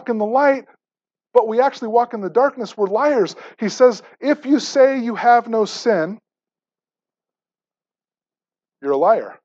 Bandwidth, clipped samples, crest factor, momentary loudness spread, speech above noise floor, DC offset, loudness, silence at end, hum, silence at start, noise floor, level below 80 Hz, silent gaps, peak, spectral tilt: 7.8 kHz; under 0.1%; 18 dB; 9 LU; over 73 dB; under 0.1%; -18 LUFS; 0.1 s; none; 0.05 s; under -90 dBFS; -78 dBFS; none; -2 dBFS; -5 dB/octave